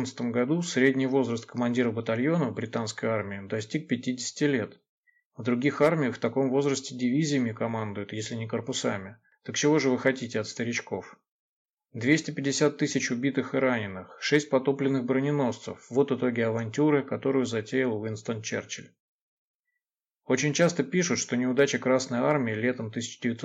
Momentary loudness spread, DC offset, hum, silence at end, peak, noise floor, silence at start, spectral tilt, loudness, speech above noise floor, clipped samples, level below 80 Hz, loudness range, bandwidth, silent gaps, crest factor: 9 LU; under 0.1%; none; 0 s; -10 dBFS; -87 dBFS; 0 s; -5 dB/octave; -27 LUFS; 60 dB; under 0.1%; -76 dBFS; 3 LU; 9.2 kHz; 4.89-5.03 s, 5.25-5.31 s, 11.31-11.77 s, 19.00-19.64 s; 18 dB